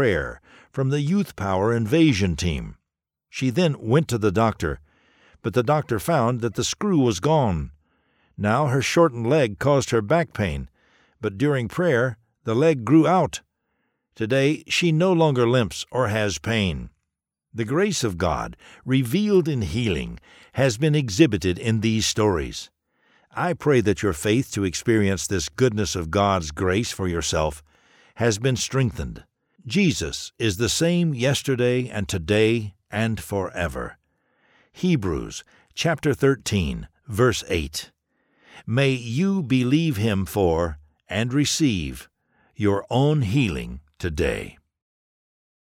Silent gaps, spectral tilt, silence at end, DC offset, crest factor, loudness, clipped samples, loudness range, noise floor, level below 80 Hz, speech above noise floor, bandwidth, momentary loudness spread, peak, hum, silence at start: none; -5.5 dB/octave; 1.15 s; under 0.1%; 18 dB; -22 LUFS; under 0.1%; 3 LU; -83 dBFS; -44 dBFS; 61 dB; 17 kHz; 13 LU; -4 dBFS; none; 0 s